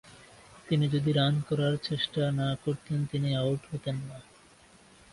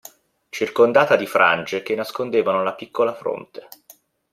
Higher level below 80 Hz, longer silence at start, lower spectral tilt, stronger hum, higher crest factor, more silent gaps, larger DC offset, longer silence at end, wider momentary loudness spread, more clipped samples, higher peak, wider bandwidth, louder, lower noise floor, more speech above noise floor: first, -60 dBFS vs -68 dBFS; second, 0.05 s vs 0.55 s; first, -7 dB/octave vs -4.5 dB/octave; neither; about the same, 16 dB vs 20 dB; neither; neither; first, 0.9 s vs 0.75 s; second, 9 LU vs 16 LU; neither; second, -14 dBFS vs -2 dBFS; second, 11.5 kHz vs 16 kHz; second, -30 LUFS vs -20 LUFS; first, -57 dBFS vs -52 dBFS; second, 29 dB vs 33 dB